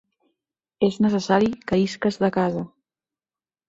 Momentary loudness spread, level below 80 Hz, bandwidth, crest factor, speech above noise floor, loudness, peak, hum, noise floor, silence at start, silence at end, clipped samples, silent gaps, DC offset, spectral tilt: 6 LU; -56 dBFS; 8 kHz; 18 dB; over 69 dB; -22 LUFS; -6 dBFS; none; under -90 dBFS; 0.8 s; 1 s; under 0.1%; none; under 0.1%; -6.5 dB/octave